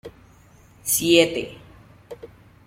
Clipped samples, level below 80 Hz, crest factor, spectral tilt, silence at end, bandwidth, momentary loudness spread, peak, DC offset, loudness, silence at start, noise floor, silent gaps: under 0.1%; -56 dBFS; 22 dB; -2.5 dB/octave; 0.4 s; 16.5 kHz; 25 LU; -2 dBFS; under 0.1%; -19 LUFS; 0.05 s; -52 dBFS; none